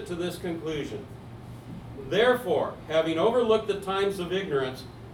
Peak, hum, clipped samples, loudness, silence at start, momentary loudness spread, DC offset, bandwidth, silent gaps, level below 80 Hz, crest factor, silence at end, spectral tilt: -10 dBFS; none; under 0.1%; -27 LUFS; 0 s; 19 LU; under 0.1%; 17.5 kHz; none; -54 dBFS; 18 dB; 0 s; -5.5 dB/octave